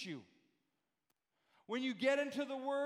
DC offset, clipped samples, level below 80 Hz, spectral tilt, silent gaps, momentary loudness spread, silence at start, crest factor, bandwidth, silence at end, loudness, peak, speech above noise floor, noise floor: under 0.1%; under 0.1%; under -90 dBFS; -4.5 dB/octave; none; 12 LU; 0 s; 18 dB; 12.5 kHz; 0 s; -39 LUFS; -22 dBFS; 48 dB; -86 dBFS